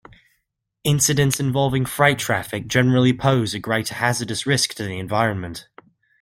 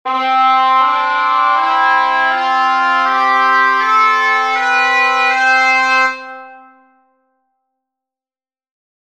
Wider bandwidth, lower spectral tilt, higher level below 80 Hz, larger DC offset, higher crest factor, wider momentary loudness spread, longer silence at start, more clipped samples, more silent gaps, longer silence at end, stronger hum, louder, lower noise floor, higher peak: first, 16.5 kHz vs 9.8 kHz; first, -4.5 dB/octave vs 1 dB/octave; first, -50 dBFS vs -72 dBFS; second, under 0.1% vs 0.3%; first, 20 dB vs 14 dB; first, 7 LU vs 3 LU; first, 0.85 s vs 0.05 s; neither; neither; second, 0.6 s vs 2.5 s; neither; second, -20 LUFS vs -12 LUFS; second, -74 dBFS vs under -90 dBFS; about the same, -2 dBFS vs 0 dBFS